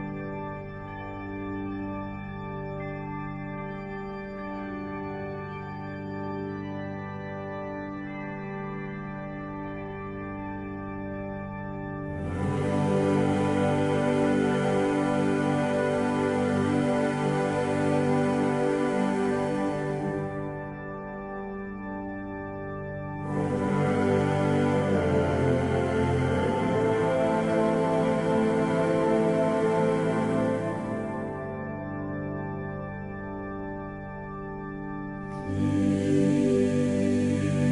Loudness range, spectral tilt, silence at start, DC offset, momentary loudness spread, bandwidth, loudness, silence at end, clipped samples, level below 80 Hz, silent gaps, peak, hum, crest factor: 10 LU; -7.5 dB/octave; 0 s; under 0.1%; 12 LU; 11 kHz; -28 LUFS; 0 s; under 0.1%; -50 dBFS; none; -12 dBFS; none; 14 dB